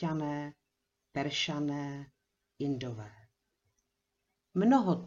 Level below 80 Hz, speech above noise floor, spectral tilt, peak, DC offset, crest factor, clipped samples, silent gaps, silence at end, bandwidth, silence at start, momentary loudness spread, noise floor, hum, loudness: -70 dBFS; 52 dB; -6 dB/octave; -14 dBFS; under 0.1%; 20 dB; under 0.1%; none; 0 s; 7.6 kHz; 0 s; 20 LU; -84 dBFS; none; -33 LUFS